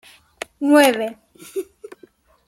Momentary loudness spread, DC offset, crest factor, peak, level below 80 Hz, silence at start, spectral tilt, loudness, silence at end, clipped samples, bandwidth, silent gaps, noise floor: 22 LU; under 0.1%; 20 dB; -2 dBFS; -66 dBFS; 0.6 s; -2.5 dB/octave; -17 LUFS; 0.85 s; under 0.1%; 15.5 kHz; none; -52 dBFS